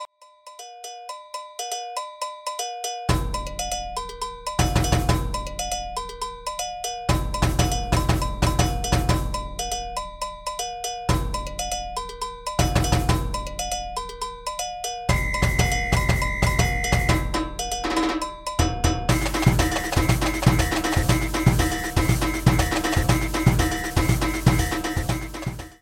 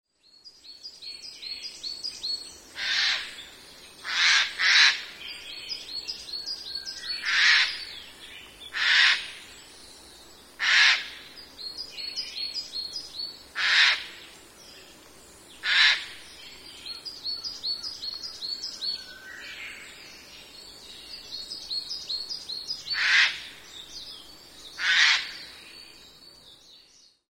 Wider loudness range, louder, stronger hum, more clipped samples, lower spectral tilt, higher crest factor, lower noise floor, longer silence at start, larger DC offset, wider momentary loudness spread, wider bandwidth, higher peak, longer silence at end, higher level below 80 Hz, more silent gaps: second, 6 LU vs 10 LU; about the same, -24 LUFS vs -24 LUFS; neither; neither; first, -4.5 dB/octave vs 2 dB/octave; about the same, 20 dB vs 24 dB; second, -48 dBFS vs -58 dBFS; second, 0 s vs 0.45 s; neither; second, 11 LU vs 25 LU; about the same, 17 kHz vs 16 kHz; first, -2 dBFS vs -6 dBFS; second, 0.1 s vs 0.55 s; first, -30 dBFS vs -66 dBFS; neither